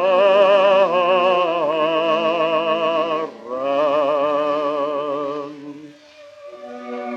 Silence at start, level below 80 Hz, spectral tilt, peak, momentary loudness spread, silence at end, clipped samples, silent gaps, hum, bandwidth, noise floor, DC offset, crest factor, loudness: 0 s; -78 dBFS; -5 dB/octave; -2 dBFS; 18 LU; 0 s; under 0.1%; none; none; 7.4 kHz; -44 dBFS; under 0.1%; 16 dB; -18 LUFS